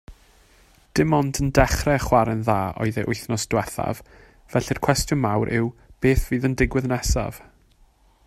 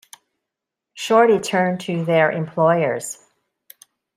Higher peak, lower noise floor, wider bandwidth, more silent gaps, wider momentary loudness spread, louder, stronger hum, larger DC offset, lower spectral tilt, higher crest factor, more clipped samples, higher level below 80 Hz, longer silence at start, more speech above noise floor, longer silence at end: about the same, 0 dBFS vs -2 dBFS; second, -57 dBFS vs -83 dBFS; about the same, 15 kHz vs 15.5 kHz; neither; second, 8 LU vs 15 LU; second, -23 LUFS vs -18 LUFS; neither; neither; about the same, -5.5 dB/octave vs -5 dB/octave; about the same, 22 dB vs 18 dB; neither; first, -34 dBFS vs -68 dBFS; second, 0.1 s vs 0.95 s; second, 35 dB vs 66 dB; second, 0.9 s vs 1.05 s